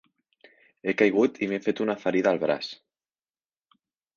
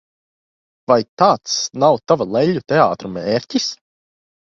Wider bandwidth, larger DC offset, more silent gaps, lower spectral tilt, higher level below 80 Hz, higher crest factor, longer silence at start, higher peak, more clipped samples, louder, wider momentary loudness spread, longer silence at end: about the same, 7.2 kHz vs 7.6 kHz; neither; second, none vs 1.09-1.17 s; first, -6 dB/octave vs -4.5 dB/octave; second, -72 dBFS vs -58 dBFS; about the same, 22 dB vs 18 dB; about the same, 0.85 s vs 0.9 s; second, -6 dBFS vs 0 dBFS; neither; second, -25 LUFS vs -17 LUFS; first, 12 LU vs 9 LU; first, 1.4 s vs 0.75 s